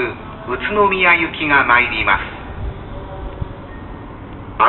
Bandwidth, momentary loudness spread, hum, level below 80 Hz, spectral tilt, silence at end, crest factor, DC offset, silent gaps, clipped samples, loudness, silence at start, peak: 4.3 kHz; 21 LU; none; -34 dBFS; -10 dB/octave; 0 s; 18 dB; under 0.1%; none; under 0.1%; -14 LUFS; 0 s; 0 dBFS